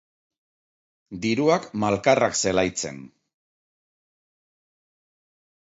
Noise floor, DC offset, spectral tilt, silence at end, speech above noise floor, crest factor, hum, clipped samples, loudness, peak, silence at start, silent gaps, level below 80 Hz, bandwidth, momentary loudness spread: under -90 dBFS; under 0.1%; -4 dB/octave; 2.55 s; over 67 dB; 22 dB; none; under 0.1%; -22 LUFS; -4 dBFS; 1.1 s; none; -58 dBFS; 8.2 kHz; 13 LU